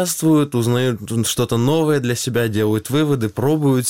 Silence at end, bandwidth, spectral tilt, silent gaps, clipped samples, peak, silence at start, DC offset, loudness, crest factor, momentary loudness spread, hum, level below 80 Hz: 0 s; 17 kHz; -5.5 dB/octave; none; under 0.1%; -6 dBFS; 0 s; 0.4%; -18 LUFS; 12 dB; 4 LU; none; -50 dBFS